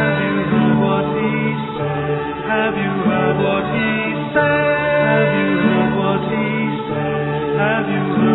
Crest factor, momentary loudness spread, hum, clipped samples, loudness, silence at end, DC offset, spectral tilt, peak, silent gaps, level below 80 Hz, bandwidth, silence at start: 16 dB; 6 LU; none; under 0.1%; -17 LUFS; 0 s; under 0.1%; -10.5 dB/octave; -2 dBFS; none; -46 dBFS; 4.1 kHz; 0 s